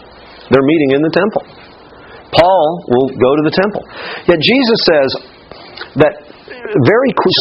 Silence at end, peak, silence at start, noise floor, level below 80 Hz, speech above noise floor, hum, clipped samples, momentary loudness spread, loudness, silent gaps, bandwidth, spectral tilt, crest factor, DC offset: 0 s; 0 dBFS; 0.5 s; -37 dBFS; -46 dBFS; 25 dB; none; under 0.1%; 14 LU; -12 LUFS; none; 7.2 kHz; -7.5 dB/octave; 12 dB; under 0.1%